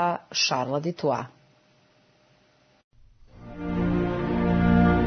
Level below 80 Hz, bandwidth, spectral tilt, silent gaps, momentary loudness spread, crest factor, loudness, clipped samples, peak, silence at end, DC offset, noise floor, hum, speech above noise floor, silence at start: -40 dBFS; 6.6 kHz; -5.5 dB/octave; 2.84-2.91 s; 13 LU; 18 dB; -25 LUFS; under 0.1%; -8 dBFS; 0 s; under 0.1%; -62 dBFS; none; 35 dB; 0 s